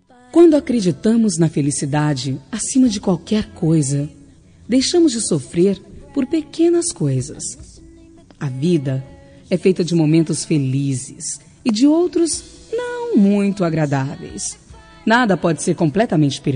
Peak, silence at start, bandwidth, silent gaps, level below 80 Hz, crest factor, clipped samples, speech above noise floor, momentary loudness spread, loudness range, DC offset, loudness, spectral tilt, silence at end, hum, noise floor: -2 dBFS; 0.35 s; 10 kHz; none; -50 dBFS; 16 dB; under 0.1%; 28 dB; 12 LU; 3 LU; under 0.1%; -18 LUFS; -5.5 dB/octave; 0 s; none; -45 dBFS